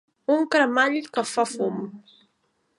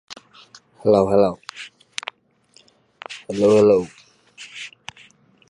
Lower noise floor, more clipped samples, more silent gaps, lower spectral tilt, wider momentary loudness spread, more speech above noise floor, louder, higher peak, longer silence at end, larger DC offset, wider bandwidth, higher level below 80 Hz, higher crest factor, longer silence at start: first, -71 dBFS vs -57 dBFS; neither; neither; second, -3.5 dB/octave vs -6 dB/octave; second, 10 LU vs 25 LU; first, 48 dB vs 41 dB; second, -23 LUFS vs -18 LUFS; second, -8 dBFS vs -4 dBFS; about the same, 0.8 s vs 0.8 s; neither; about the same, 11.5 kHz vs 11 kHz; second, -78 dBFS vs -56 dBFS; about the same, 18 dB vs 18 dB; first, 0.3 s vs 0.1 s